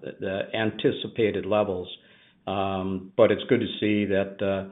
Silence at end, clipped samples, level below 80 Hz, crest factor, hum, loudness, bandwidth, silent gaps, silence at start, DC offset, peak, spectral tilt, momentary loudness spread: 0 s; under 0.1%; -68 dBFS; 20 dB; none; -26 LUFS; 4 kHz; none; 0 s; under 0.1%; -4 dBFS; -4.5 dB/octave; 10 LU